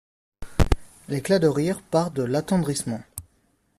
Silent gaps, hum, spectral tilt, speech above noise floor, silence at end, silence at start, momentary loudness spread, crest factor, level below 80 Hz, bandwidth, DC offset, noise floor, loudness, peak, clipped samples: none; none; -6 dB/octave; 43 dB; 0.6 s; 0.4 s; 13 LU; 22 dB; -34 dBFS; 14.5 kHz; under 0.1%; -66 dBFS; -25 LUFS; -2 dBFS; under 0.1%